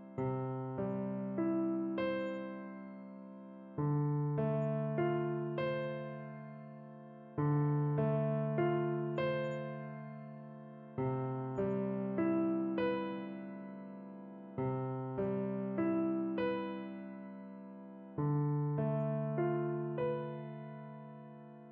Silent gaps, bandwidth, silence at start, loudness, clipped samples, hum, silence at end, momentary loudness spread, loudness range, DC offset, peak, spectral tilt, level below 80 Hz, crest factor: none; 4.5 kHz; 0 s; -37 LUFS; under 0.1%; none; 0 s; 16 LU; 3 LU; under 0.1%; -22 dBFS; -8 dB/octave; -74 dBFS; 14 dB